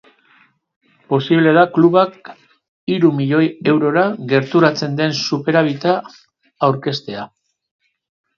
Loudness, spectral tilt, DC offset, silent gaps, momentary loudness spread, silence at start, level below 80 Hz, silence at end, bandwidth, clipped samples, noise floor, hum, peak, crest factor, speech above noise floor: -16 LUFS; -6.5 dB/octave; under 0.1%; 2.69-2.87 s; 10 LU; 1.1 s; -64 dBFS; 1.1 s; 7 kHz; under 0.1%; -54 dBFS; none; 0 dBFS; 16 dB; 39 dB